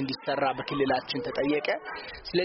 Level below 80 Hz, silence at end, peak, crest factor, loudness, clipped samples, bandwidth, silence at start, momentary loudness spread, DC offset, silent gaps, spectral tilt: -58 dBFS; 0 s; -14 dBFS; 16 dB; -29 LUFS; under 0.1%; 6 kHz; 0 s; 6 LU; under 0.1%; none; -3 dB/octave